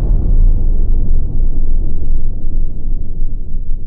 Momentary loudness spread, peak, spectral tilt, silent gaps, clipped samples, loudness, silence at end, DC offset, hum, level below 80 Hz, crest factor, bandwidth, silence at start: 9 LU; -2 dBFS; -13.5 dB/octave; none; under 0.1%; -21 LUFS; 0 s; under 0.1%; none; -10 dBFS; 6 dB; 0.9 kHz; 0 s